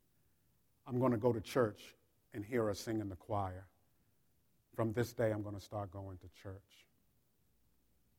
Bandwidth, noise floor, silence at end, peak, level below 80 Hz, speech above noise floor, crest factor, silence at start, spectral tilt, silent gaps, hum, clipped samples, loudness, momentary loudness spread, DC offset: 17 kHz; -78 dBFS; 1.6 s; -18 dBFS; -70 dBFS; 39 dB; 22 dB; 0.85 s; -7 dB/octave; none; none; under 0.1%; -39 LUFS; 18 LU; under 0.1%